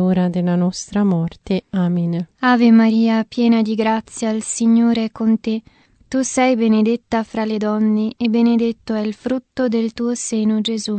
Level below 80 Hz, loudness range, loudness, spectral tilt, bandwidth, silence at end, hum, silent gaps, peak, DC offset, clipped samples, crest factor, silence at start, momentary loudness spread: -54 dBFS; 3 LU; -18 LUFS; -5.5 dB/octave; 9 kHz; 0 s; none; none; -2 dBFS; under 0.1%; under 0.1%; 14 dB; 0 s; 8 LU